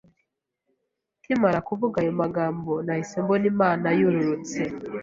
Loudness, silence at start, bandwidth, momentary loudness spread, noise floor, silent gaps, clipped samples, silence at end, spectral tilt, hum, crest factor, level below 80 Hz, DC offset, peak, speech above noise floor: -24 LUFS; 1.3 s; 7.8 kHz; 7 LU; -79 dBFS; none; under 0.1%; 0 s; -7 dB/octave; none; 18 dB; -60 dBFS; under 0.1%; -8 dBFS; 55 dB